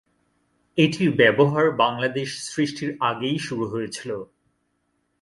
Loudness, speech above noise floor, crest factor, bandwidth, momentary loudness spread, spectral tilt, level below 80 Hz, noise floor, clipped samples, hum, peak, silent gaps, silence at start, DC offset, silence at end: -22 LUFS; 50 dB; 20 dB; 11.5 kHz; 12 LU; -5.5 dB/octave; -62 dBFS; -71 dBFS; under 0.1%; none; -4 dBFS; none; 0.75 s; under 0.1%; 0.95 s